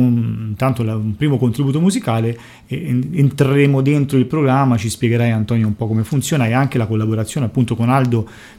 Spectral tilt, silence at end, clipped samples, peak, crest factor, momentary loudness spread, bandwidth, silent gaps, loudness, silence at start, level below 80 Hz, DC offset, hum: -7 dB/octave; 0.1 s; under 0.1%; 0 dBFS; 16 dB; 6 LU; 15.5 kHz; none; -17 LUFS; 0 s; -48 dBFS; under 0.1%; none